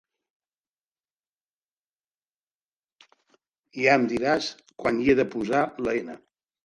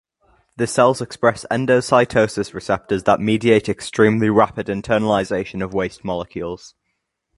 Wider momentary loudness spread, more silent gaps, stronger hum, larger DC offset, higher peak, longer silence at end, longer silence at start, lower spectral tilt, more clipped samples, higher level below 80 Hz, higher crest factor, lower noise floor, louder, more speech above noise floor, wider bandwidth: about the same, 11 LU vs 11 LU; neither; neither; neither; second, -6 dBFS vs 0 dBFS; second, 0.45 s vs 0.7 s; first, 3.75 s vs 0.6 s; about the same, -5.5 dB/octave vs -5.5 dB/octave; neither; second, -60 dBFS vs -48 dBFS; about the same, 22 dB vs 18 dB; first, under -90 dBFS vs -74 dBFS; second, -24 LUFS vs -19 LUFS; first, over 66 dB vs 56 dB; about the same, 11 kHz vs 11.5 kHz